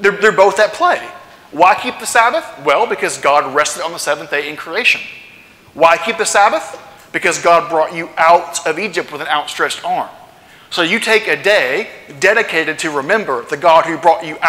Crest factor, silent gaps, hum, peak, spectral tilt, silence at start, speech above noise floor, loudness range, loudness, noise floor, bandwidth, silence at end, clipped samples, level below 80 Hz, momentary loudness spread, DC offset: 14 dB; none; none; 0 dBFS; -2 dB/octave; 0 s; 28 dB; 2 LU; -14 LUFS; -42 dBFS; 16.5 kHz; 0 s; under 0.1%; -58 dBFS; 9 LU; under 0.1%